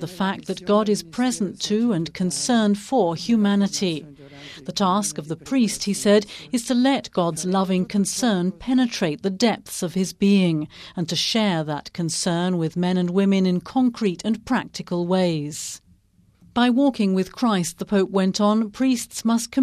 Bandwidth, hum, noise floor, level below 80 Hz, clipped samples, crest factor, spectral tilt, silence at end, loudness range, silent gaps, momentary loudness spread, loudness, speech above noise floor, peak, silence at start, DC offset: 14.5 kHz; none; -58 dBFS; -56 dBFS; under 0.1%; 16 dB; -5 dB/octave; 0 s; 2 LU; none; 8 LU; -22 LUFS; 37 dB; -6 dBFS; 0 s; under 0.1%